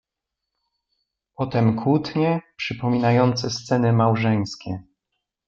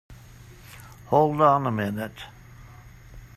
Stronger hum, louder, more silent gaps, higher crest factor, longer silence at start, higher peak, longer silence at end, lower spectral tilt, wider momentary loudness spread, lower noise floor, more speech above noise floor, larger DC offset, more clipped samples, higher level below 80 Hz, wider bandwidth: neither; about the same, -21 LUFS vs -23 LUFS; neither; about the same, 18 dB vs 20 dB; first, 1.4 s vs 0.1 s; about the same, -4 dBFS vs -6 dBFS; first, 0.65 s vs 0.1 s; about the same, -7 dB/octave vs -7.5 dB/octave; second, 11 LU vs 26 LU; first, -84 dBFS vs -47 dBFS; first, 63 dB vs 25 dB; neither; neither; second, -58 dBFS vs -52 dBFS; second, 7.4 kHz vs 15 kHz